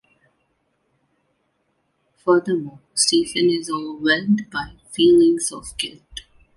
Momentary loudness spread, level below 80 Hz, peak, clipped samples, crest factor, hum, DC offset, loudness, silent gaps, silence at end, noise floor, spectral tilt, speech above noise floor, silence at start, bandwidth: 14 LU; -54 dBFS; -4 dBFS; under 0.1%; 18 dB; none; under 0.1%; -19 LUFS; none; 0.35 s; -69 dBFS; -3.5 dB/octave; 50 dB; 2.25 s; 11.5 kHz